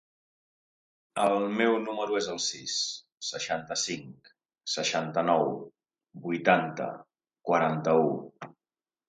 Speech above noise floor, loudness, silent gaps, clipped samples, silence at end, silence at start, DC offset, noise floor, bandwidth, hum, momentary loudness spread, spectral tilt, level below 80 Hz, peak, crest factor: over 62 dB; -29 LUFS; none; under 0.1%; 0.6 s; 1.15 s; under 0.1%; under -90 dBFS; 11.5 kHz; none; 15 LU; -3.5 dB/octave; -74 dBFS; -8 dBFS; 22 dB